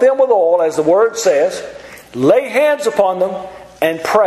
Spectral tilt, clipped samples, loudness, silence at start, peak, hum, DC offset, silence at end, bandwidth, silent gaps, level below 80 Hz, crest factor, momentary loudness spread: -4.5 dB/octave; under 0.1%; -14 LUFS; 0 s; 0 dBFS; none; under 0.1%; 0 s; 14 kHz; none; -56 dBFS; 14 dB; 16 LU